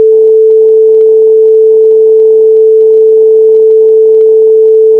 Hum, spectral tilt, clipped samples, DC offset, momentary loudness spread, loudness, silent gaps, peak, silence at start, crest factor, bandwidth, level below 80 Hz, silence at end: none; -7 dB/octave; 0.3%; 0.4%; 0 LU; -4 LUFS; none; 0 dBFS; 0 s; 4 dB; 1 kHz; -70 dBFS; 0 s